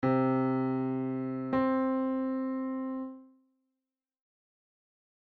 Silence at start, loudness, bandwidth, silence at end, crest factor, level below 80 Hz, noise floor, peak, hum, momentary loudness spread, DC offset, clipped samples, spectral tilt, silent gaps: 0 s; -31 LUFS; 4.6 kHz; 2.1 s; 14 dB; -68 dBFS; -90 dBFS; -18 dBFS; none; 8 LU; under 0.1%; under 0.1%; -10.5 dB/octave; none